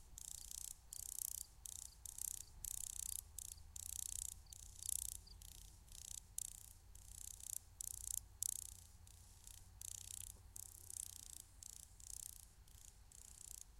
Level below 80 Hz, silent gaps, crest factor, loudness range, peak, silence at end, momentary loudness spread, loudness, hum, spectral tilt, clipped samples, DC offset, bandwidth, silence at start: -64 dBFS; none; 32 dB; 6 LU; -20 dBFS; 0 s; 16 LU; -49 LUFS; none; 0 dB/octave; under 0.1%; under 0.1%; 16.5 kHz; 0 s